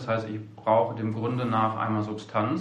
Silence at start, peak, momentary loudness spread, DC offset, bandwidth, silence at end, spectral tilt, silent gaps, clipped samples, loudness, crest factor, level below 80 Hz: 0 s; -10 dBFS; 6 LU; under 0.1%; 8.4 kHz; 0 s; -8 dB/octave; none; under 0.1%; -27 LUFS; 18 dB; -68 dBFS